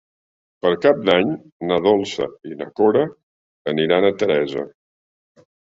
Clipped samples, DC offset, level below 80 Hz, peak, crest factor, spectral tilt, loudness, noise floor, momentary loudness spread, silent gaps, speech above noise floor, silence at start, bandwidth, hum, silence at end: under 0.1%; under 0.1%; -58 dBFS; -2 dBFS; 18 dB; -6 dB/octave; -19 LUFS; under -90 dBFS; 12 LU; 1.52-1.60 s, 3.23-3.65 s; over 72 dB; 0.65 s; 7.8 kHz; none; 1.1 s